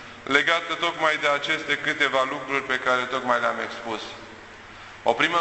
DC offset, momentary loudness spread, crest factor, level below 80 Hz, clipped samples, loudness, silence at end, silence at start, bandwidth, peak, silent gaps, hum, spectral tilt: under 0.1%; 19 LU; 22 dB; -62 dBFS; under 0.1%; -23 LUFS; 0 s; 0 s; 8.4 kHz; -4 dBFS; none; none; -3 dB/octave